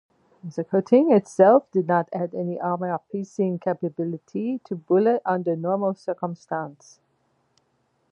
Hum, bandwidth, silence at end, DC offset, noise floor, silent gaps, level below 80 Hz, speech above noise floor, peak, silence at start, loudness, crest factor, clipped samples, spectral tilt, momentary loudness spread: none; 10.5 kHz; 1.4 s; under 0.1%; -69 dBFS; none; -76 dBFS; 46 dB; -4 dBFS; 0.45 s; -23 LUFS; 20 dB; under 0.1%; -8.5 dB/octave; 14 LU